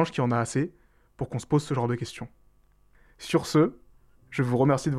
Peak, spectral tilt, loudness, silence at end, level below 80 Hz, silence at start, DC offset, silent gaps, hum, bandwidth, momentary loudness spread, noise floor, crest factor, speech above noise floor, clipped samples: -10 dBFS; -6.5 dB/octave; -27 LUFS; 0 s; -56 dBFS; 0 s; under 0.1%; none; 50 Hz at -50 dBFS; 13.5 kHz; 14 LU; -60 dBFS; 16 dB; 35 dB; under 0.1%